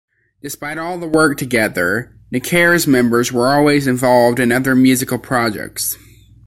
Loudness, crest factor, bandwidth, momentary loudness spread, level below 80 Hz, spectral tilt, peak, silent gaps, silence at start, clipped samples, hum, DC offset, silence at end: -15 LUFS; 14 dB; 16.5 kHz; 12 LU; -48 dBFS; -4.5 dB/octave; -2 dBFS; none; 0.45 s; under 0.1%; none; under 0.1%; 0.5 s